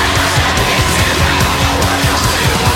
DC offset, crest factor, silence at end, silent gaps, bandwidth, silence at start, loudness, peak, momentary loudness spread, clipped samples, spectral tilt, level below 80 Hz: under 0.1%; 12 dB; 0 s; none; 18 kHz; 0 s; -12 LUFS; 0 dBFS; 1 LU; under 0.1%; -3.5 dB/octave; -22 dBFS